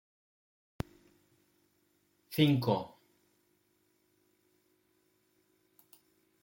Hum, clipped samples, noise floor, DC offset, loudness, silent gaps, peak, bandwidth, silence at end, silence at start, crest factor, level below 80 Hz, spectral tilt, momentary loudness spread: none; under 0.1%; -74 dBFS; under 0.1%; -31 LUFS; none; -14 dBFS; 16.5 kHz; 3.55 s; 2.3 s; 24 dB; -64 dBFS; -7 dB/octave; 17 LU